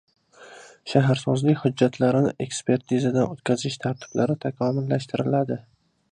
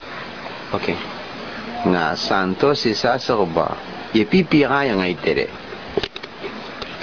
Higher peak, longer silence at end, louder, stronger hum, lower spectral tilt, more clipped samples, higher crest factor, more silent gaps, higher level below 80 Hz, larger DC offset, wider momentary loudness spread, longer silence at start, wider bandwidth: about the same, -4 dBFS vs -4 dBFS; first, 0.5 s vs 0 s; second, -24 LUFS vs -20 LUFS; neither; about the same, -6.5 dB/octave vs -6 dB/octave; neither; about the same, 20 dB vs 18 dB; neither; second, -64 dBFS vs -48 dBFS; second, under 0.1% vs 0.4%; second, 7 LU vs 15 LU; first, 0.4 s vs 0 s; first, 10 kHz vs 5.4 kHz